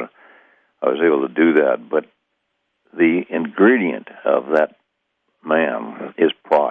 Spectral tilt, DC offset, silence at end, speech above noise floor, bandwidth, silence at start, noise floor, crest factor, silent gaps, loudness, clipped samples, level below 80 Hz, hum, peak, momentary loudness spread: -8 dB/octave; under 0.1%; 0 s; 55 dB; 3.9 kHz; 0 s; -72 dBFS; 18 dB; none; -18 LUFS; under 0.1%; -72 dBFS; none; -2 dBFS; 11 LU